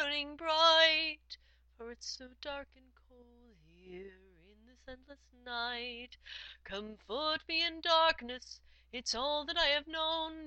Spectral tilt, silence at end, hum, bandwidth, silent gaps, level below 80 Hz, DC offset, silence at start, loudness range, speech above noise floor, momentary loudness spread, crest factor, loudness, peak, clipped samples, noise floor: -1.5 dB/octave; 0 s; none; 8.6 kHz; none; -62 dBFS; under 0.1%; 0 s; 17 LU; 26 dB; 25 LU; 24 dB; -32 LUFS; -12 dBFS; under 0.1%; -63 dBFS